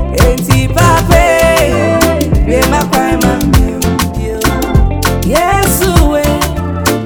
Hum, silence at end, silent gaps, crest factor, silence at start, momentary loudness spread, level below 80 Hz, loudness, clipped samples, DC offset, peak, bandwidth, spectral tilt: none; 0 s; none; 10 dB; 0 s; 6 LU; -16 dBFS; -10 LUFS; 0.5%; under 0.1%; 0 dBFS; over 20 kHz; -5 dB/octave